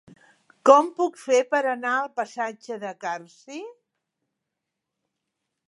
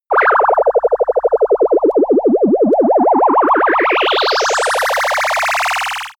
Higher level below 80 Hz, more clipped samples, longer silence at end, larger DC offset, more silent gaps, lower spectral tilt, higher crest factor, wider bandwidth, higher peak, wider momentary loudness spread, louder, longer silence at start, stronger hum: second, -84 dBFS vs -50 dBFS; neither; first, 1.95 s vs 0.1 s; neither; neither; about the same, -3 dB/octave vs -3 dB/octave; first, 24 dB vs 10 dB; second, 11.5 kHz vs over 20 kHz; about the same, -2 dBFS vs -4 dBFS; first, 22 LU vs 3 LU; second, -23 LUFS vs -13 LUFS; first, 0.65 s vs 0.1 s; neither